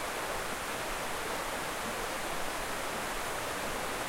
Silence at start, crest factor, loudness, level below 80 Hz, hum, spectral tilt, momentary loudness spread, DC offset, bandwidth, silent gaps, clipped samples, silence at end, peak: 0 s; 14 dB; -35 LUFS; -50 dBFS; none; -2 dB/octave; 0 LU; under 0.1%; 16 kHz; none; under 0.1%; 0 s; -22 dBFS